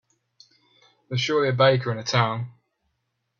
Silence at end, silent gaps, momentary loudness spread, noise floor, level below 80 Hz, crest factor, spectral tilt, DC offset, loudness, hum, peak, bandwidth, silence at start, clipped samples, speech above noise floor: 0.9 s; none; 13 LU; -76 dBFS; -64 dBFS; 22 dB; -5 dB/octave; under 0.1%; -23 LUFS; none; -4 dBFS; 7.4 kHz; 1.1 s; under 0.1%; 54 dB